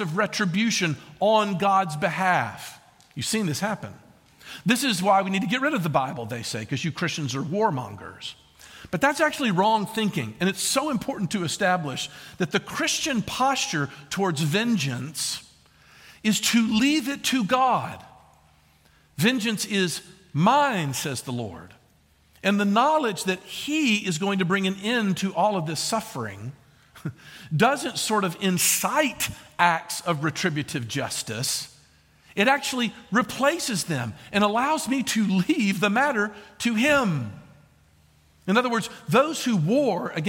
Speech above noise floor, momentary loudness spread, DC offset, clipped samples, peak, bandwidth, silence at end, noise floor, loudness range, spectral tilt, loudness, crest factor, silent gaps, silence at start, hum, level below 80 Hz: 36 dB; 12 LU; under 0.1%; under 0.1%; -4 dBFS; 17 kHz; 0 s; -60 dBFS; 3 LU; -4 dB/octave; -24 LUFS; 22 dB; none; 0 s; none; -62 dBFS